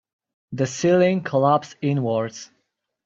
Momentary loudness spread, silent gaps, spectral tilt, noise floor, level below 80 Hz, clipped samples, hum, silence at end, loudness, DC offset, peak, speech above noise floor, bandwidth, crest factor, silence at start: 13 LU; none; -6 dB/octave; -74 dBFS; -62 dBFS; under 0.1%; none; 0.6 s; -21 LUFS; under 0.1%; -6 dBFS; 53 dB; 7.8 kHz; 18 dB; 0.5 s